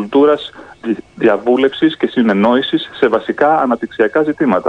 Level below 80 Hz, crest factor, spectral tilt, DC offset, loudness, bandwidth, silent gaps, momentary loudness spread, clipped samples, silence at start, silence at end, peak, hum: -54 dBFS; 14 dB; -7 dB/octave; under 0.1%; -14 LUFS; 9.2 kHz; none; 9 LU; under 0.1%; 0 s; 0 s; 0 dBFS; none